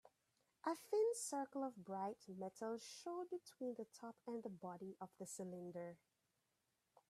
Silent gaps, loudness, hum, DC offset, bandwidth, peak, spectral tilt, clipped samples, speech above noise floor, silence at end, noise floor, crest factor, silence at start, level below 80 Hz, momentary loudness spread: none; -48 LUFS; none; under 0.1%; 14.5 kHz; -30 dBFS; -4.5 dB/octave; under 0.1%; 40 dB; 1.15 s; -87 dBFS; 18 dB; 0.05 s; under -90 dBFS; 13 LU